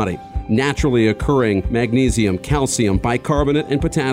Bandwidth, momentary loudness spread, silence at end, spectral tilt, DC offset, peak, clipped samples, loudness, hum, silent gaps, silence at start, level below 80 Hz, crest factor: 16 kHz; 3 LU; 0 s; -5.5 dB/octave; under 0.1%; -4 dBFS; under 0.1%; -18 LUFS; none; none; 0 s; -30 dBFS; 14 dB